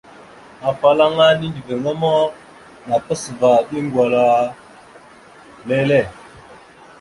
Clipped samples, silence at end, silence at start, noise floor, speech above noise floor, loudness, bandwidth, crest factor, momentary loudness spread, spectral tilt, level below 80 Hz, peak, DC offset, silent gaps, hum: under 0.1%; 0.45 s; 0.6 s; -44 dBFS; 28 dB; -17 LUFS; 11.5 kHz; 16 dB; 11 LU; -5.5 dB/octave; -54 dBFS; -2 dBFS; under 0.1%; none; none